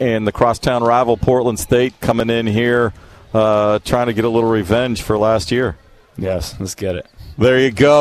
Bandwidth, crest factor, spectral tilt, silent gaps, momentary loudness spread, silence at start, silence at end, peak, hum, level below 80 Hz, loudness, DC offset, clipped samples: 14 kHz; 14 dB; -5.5 dB/octave; none; 9 LU; 0 s; 0 s; -2 dBFS; none; -38 dBFS; -16 LUFS; under 0.1%; under 0.1%